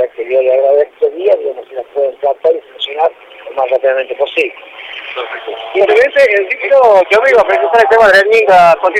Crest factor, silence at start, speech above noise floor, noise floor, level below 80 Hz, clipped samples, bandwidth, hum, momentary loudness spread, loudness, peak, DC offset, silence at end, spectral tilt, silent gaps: 10 dB; 0 s; 20 dB; -29 dBFS; -52 dBFS; under 0.1%; 12.5 kHz; none; 15 LU; -10 LUFS; 0 dBFS; under 0.1%; 0 s; -3.5 dB/octave; none